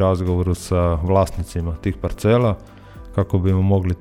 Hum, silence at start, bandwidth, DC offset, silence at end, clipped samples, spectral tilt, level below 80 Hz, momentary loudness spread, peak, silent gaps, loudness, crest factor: none; 0 s; 13 kHz; under 0.1%; 0 s; under 0.1%; -8 dB/octave; -32 dBFS; 8 LU; -4 dBFS; none; -20 LUFS; 14 dB